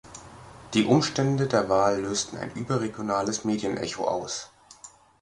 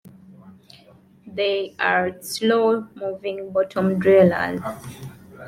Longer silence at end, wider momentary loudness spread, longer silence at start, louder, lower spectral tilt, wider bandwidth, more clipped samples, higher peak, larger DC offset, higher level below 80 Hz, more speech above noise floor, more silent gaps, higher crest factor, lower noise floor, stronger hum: first, 0.35 s vs 0 s; first, 24 LU vs 20 LU; about the same, 0.05 s vs 0.05 s; second, -26 LUFS vs -21 LUFS; about the same, -5 dB/octave vs -5.5 dB/octave; second, 11.5 kHz vs 16 kHz; neither; about the same, -6 dBFS vs -4 dBFS; neither; about the same, -58 dBFS vs -60 dBFS; second, 25 dB vs 31 dB; neither; about the same, 20 dB vs 18 dB; about the same, -51 dBFS vs -51 dBFS; neither